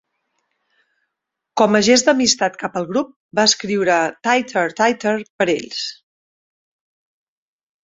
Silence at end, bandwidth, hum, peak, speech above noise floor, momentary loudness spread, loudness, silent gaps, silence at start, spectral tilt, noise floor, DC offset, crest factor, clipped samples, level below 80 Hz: 1.9 s; 8.2 kHz; none; 0 dBFS; 63 dB; 11 LU; -17 LUFS; 3.16-3.29 s, 5.30-5.39 s; 1.55 s; -2.5 dB/octave; -80 dBFS; under 0.1%; 20 dB; under 0.1%; -62 dBFS